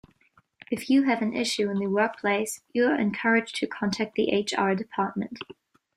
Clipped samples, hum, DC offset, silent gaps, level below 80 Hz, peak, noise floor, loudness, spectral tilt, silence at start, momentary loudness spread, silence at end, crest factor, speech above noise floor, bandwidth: under 0.1%; none; under 0.1%; none; -68 dBFS; -8 dBFS; -64 dBFS; -26 LUFS; -4.5 dB/octave; 0.7 s; 10 LU; 0.45 s; 18 dB; 38 dB; 14.5 kHz